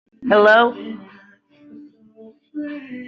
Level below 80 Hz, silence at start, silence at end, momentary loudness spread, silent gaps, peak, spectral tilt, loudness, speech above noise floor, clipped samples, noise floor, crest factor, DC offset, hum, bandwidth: -68 dBFS; 0.2 s; 0 s; 23 LU; none; -2 dBFS; -1.5 dB/octave; -14 LUFS; 34 dB; under 0.1%; -50 dBFS; 18 dB; under 0.1%; none; 7 kHz